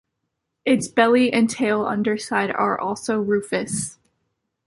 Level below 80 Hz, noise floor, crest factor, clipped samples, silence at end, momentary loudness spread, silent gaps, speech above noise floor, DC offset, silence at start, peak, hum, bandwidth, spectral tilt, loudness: -60 dBFS; -78 dBFS; 18 dB; under 0.1%; 0.75 s; 9 LU; none; 57 dB; under 0.1%; 0.65 s; -2 dBFS; none; 11.5 kHz; -4.5 dB/octave; -21 LUFS